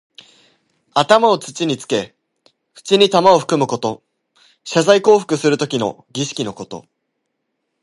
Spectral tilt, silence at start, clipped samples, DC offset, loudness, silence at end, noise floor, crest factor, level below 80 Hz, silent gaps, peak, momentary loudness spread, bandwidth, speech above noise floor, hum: -4.5 dB/octave; 0.95 s; under 0.1%; under 0.1%; -16 LUFS; 1.05 s; -73 dBFS; 18 dB; -62 dBFS; none; 0 dBFS; 20 LU; 11.5 kHz; 58 dB; none